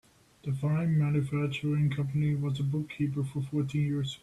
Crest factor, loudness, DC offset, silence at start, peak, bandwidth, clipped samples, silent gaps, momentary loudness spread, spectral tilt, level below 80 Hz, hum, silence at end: 12 dB; -30 LUFS; under 0.1%; 0.45 s; -18 dBFS; 11 kHz; under 0.1%; none; 5 LU; -8 dB/octave; -60 dBFS; none; 0.05 s